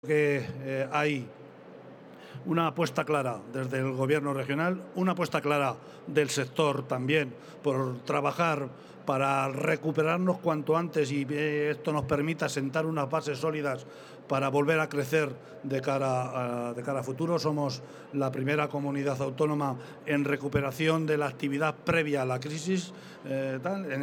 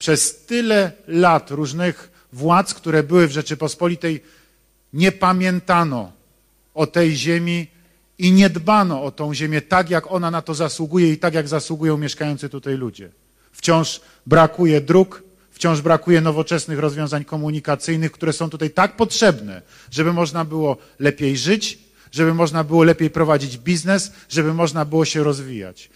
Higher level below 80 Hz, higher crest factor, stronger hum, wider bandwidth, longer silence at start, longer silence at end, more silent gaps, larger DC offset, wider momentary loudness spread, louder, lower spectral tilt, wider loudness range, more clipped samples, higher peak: second, -66 dBFS vs -54 dBFS; about the same, 18 dB vs 16 dB; neither; first, 18.5 kHz vs 14.5 kHz; about the same, 0.05 s vs 0 s; second, 0 s vs 0.15 s; neither; neither; about the same, 9 LU vs 11 LU; second, -30 LUFS vs -18 LUFS; about the same, -6 dB/octave vs -5.5 dB/octave; about the same, 2 LU vs 3 LU; neither; second, -10 dBFS vs -2 dBFS